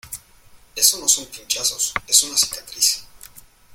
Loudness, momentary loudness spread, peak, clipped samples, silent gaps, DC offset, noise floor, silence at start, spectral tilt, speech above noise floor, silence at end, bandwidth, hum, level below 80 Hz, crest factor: -18 LUFS; 15 LU; 0 dBFS; under 0.1%; none; under 0.1%; -49 dBFS; 0.05 s; 2 dB/octave; 29 dB; 0.35 s; 17 kHz; none; -54 dBFS; 22 dB